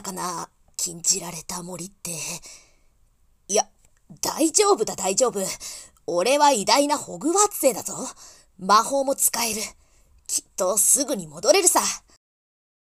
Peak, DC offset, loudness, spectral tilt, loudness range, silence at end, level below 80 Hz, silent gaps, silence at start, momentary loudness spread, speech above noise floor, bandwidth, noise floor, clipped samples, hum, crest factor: -2 dBFS; under 0.1%; -21 LUFS; -1.5 dB/octave; 7 LU; 0.9 s; -60 dBFS; none; 0 s; 16 LU; 37 dB; 16 kHz; -60 dBFS; under 0.1%; none; 22 dB